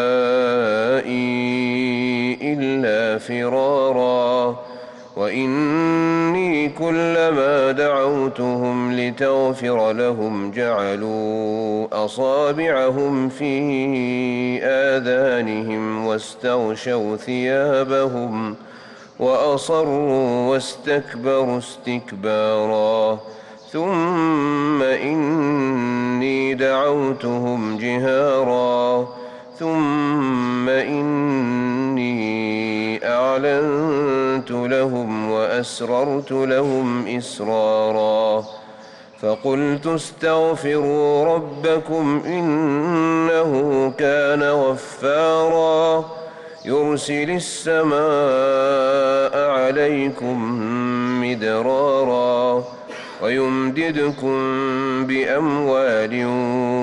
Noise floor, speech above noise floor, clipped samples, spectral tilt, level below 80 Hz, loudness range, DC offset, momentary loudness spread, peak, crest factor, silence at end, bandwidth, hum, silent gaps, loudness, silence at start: -42 dBFS; 23 dB; under 0.1%; -6 dB/octave; -62 dBFS; 3 LU; under 0.1%; 6 LU; -10 dBFS; 10 dB; 0 s; 11 kHz; none; none; -19 LUFS; 0 s